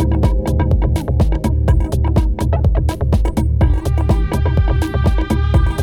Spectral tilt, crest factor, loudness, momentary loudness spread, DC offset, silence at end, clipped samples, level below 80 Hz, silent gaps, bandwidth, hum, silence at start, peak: -8 dB/octave; 12 dB; -16 LUFS; 2 LU; under 0.1%; 0 s; under 0.1%; -16 dBFS; none; 13 kHz; none; 0 s; -2 dBFS